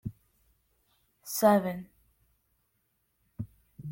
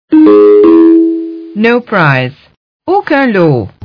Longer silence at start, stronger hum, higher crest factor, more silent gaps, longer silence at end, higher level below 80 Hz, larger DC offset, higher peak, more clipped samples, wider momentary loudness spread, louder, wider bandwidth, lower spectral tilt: about the same, 0.05 s vs 0.1 s; neither; first, 22 dB vs 8 dB; second, none vs 2.57-2.80 s; second, 0 s vs 0.15 s; second, -64 dBFS vs -50 dBFS; neither; second, -10 dBFS vs 0 dBFS; second, under 0.1% vs 2%; first, 21 LU vs 13 LU; second, -27 LUFS vs -7 LUFS; first, 16.5 kHz vs 5.4 kHz; second, -5.5 dB/octave vs -9.5 dB/octave